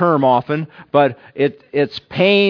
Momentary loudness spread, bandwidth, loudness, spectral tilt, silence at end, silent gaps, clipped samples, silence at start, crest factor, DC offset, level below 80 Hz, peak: 7 LU; 5.4 kHz; -17 LUFS; -8 dB/octave; 0 s; none; under 0.1%; 0 s; 16 dB; under 0.1%; -62 dBFS; 0 dBFS